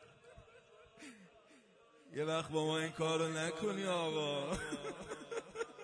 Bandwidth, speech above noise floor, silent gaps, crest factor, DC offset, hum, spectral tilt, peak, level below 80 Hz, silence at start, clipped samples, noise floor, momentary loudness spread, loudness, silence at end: 10.5 kHz; 27 dB; none; 18 dB; under 0.1%; none; -4.5 dB/octave; -22 dBFS; -68 dBFS; 0 s; under 0.1%; -66 dBFS; 20 LU; -39 LUFS; 0 s